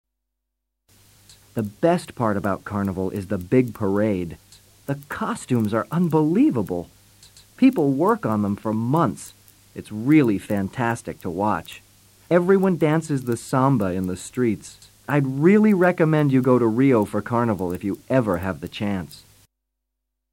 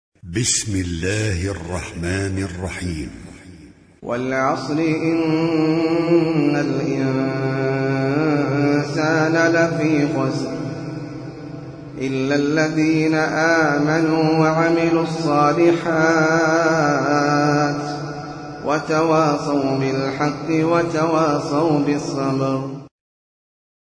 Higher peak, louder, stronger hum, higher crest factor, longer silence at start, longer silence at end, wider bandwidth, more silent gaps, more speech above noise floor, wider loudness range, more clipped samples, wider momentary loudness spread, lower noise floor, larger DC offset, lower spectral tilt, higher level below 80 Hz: about the same, -4 dBFS vs -4 dBFS; about the same, -21 LUFS vs -19 LUFS; neither; about the same, 18 dB vs 16 dB; first, 1.55 s vs 0.25 s; about the same, 1.15 s vs 1.05 s; first, 16.5 kHz vs 10.5 kHz; neither; first, 59 dB vs 26 dB; about the same, 5 LU vs 6 LU; neither; about the same, 13 LU vs 12 LU; first, -80 dBFS vs -44 dBFS; neither; first, -7.5 dB/octave vs -5.5 dB/octave; second, -56 dBFS vs -48 dBFS